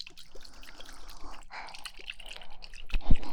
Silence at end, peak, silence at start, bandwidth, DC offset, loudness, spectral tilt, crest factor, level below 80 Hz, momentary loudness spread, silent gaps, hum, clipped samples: 0 s; -6 dBFS; 0.05 s; 9.4 kHz; under 0.1%; -42 LUFS; -4.5 dB/octave; 20 dB; -34 dBFS; 14 LU; none; none; under 0.1%